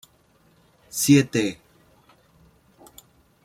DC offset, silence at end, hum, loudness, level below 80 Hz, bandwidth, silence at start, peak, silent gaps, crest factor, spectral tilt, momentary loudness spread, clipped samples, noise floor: under 0.1%; 1.9 s; none; -21 LUFS; -62 dBFS; 16.5 kHz; 0.95 s; -6 dBFS; none; 22 dB; -5 dB/octave; 17 LU; under 0.1%; -60 dBFS